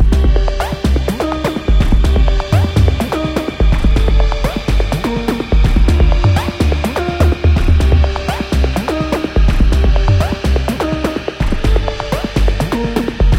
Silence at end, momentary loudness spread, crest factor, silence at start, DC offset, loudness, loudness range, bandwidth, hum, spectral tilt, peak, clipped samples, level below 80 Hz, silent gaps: 0 s; 6 LU; 12 dB; 0 s; under 0.1%; -15 LUFS; 2 LU; 15.5 kHz; none; -6.5 dB/octave; 0 dBFS; under 0.1%; -14 dBFS; none